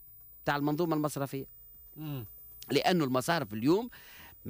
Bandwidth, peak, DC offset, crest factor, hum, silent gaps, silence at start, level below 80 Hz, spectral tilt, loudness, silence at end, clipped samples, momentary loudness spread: 15.5 kHz; -16 dBFS; under 0.1%; 16 dB; none; none; 0 s; -64 dBFS; -5.5 dB/octave; -31 LUFS; 0 s; under 0.1%; 21 LU